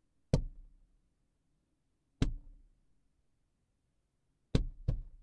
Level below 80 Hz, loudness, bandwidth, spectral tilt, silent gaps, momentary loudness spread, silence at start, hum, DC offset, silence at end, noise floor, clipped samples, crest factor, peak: -44 dBFS; -38 LUFS; 9 kHz; -7 dB/octave; none; 9 LU; 0.35 s; none; under 0.1%; 0.15 s; -79 dBFS; under 0.1%; 26 dB; -14 dBFS